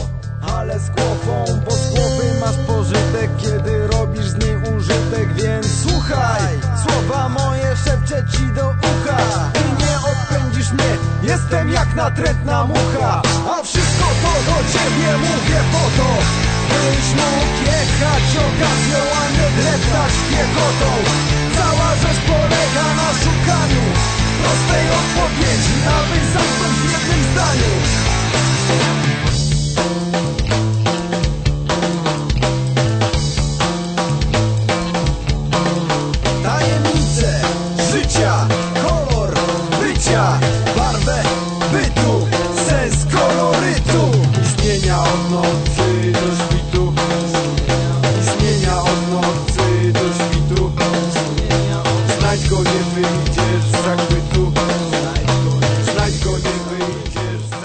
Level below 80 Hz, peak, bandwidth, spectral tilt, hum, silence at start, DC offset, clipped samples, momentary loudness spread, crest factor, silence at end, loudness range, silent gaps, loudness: -26 dBFS; -2 dBFS; 9.2 kHz; -5 dB/octave; none; 0 s; under 0.1%; under 0.1%; 4 LU; 12 dB; 0 s; 3 LU; none; -16 LUFS